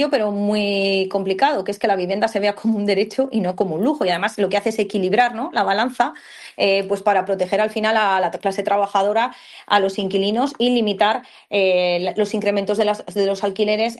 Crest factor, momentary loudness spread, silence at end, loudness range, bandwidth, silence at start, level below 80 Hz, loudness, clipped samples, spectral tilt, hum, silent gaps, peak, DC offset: 20 dB; 4 LU; 0 s; 1 LU; 12.5 kHz; 0 s; -64 dBFS; -19 LUFS; under 0.1%; -5 dB/octave; none; none; 0 dBFS; under 0.1%